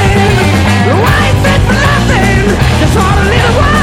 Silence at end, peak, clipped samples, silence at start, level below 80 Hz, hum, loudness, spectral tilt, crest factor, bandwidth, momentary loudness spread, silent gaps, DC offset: 0 s; 0 dBFS; 0.8%; 0 s; -18 dBFS; none; -8 LUFS; -5.5 dB/octave; 8 dB; 17 kHz; 1 LU; none; under 0.1%